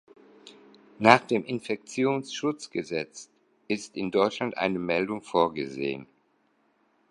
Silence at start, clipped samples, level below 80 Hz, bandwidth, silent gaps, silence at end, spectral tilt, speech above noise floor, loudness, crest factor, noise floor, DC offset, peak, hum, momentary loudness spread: 0.45 s; under 0.1%; -68 dBFS; 11.5 kHz; none; 1.05 s; -5 dB/octave; 42 dB; -27 LUFS; 28 dB; -69 dBFS; under 0.1%; 0 dBFS; none; 13 LU